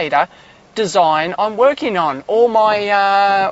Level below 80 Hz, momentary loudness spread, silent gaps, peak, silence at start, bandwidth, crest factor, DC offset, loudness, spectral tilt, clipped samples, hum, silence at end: -58 dBFS; 6 LU; none; 0 dBFS; 0 s; 8 kHz; 14 dB; under 0.1%; -15 LUFS; -4 dB/octave; under 0.1%; none; 0 s